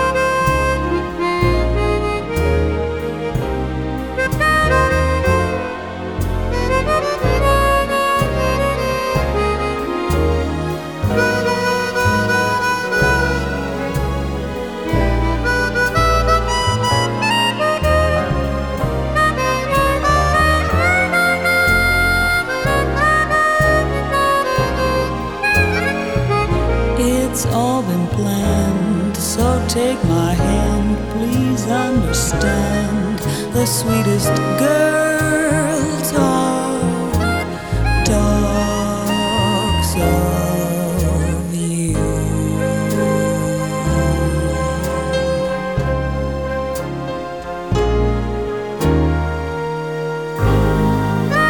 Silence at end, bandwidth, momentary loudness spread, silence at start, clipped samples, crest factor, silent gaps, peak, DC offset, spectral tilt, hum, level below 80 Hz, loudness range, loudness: 0 s; over 20 kHz; 7 LU; 0 s; under 0.1%; 16 dB; none; 0 dBFS; 0.4%; -5 dB/octave; none; -26 dBFS; 4 LU; -17 LUFS